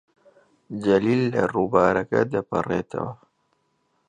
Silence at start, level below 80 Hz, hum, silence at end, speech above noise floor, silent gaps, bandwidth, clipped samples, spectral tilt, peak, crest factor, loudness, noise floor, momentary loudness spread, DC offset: 0.7 s; -56 dBFS; none; 0.95 s; 48 dB; none; 9.8 kHz; under 0.1%; -7.5 dB/octave; -4 dBFS; 20 dB; -23 LUFS; -70 dBFS; 12 LU; under 0.1%